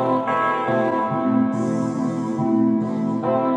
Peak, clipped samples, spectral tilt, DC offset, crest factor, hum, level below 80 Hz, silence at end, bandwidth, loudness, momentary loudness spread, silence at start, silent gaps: -8 dBFS; under 0.1%; -8 dB/octave; under 0.1%; 14 dB; none; -68 dBFS; 0 s; 9.4 kHz; -21 LUFS; 4 LU; 0 s; none